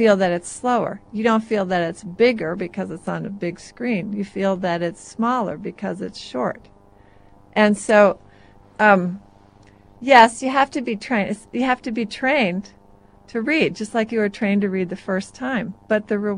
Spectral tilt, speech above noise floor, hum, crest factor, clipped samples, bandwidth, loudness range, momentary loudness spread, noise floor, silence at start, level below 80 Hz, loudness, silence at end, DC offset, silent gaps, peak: -5.5 dB/octave; 30 dB; none; 20 dB; under 0.1%; 11 kHz; 7 LU; 13 LU; -50 dBFS; 0 s; -56 dBFS; -21 LUFS; 0 s; under 0.1%; none; 0 dBFS